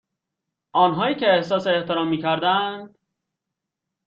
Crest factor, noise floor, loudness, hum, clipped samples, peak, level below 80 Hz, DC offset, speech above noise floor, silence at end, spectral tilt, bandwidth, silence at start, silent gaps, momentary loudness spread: 18 dB; -84 dBFS; -21 LUFS; none; under 0.1%; -6 dBFS; -66 dBFS; under 0.1%; 63 dB; 1.2 s; -6.5 dB/octave; 7.4 kHz; 0.75 s; none; 6 LU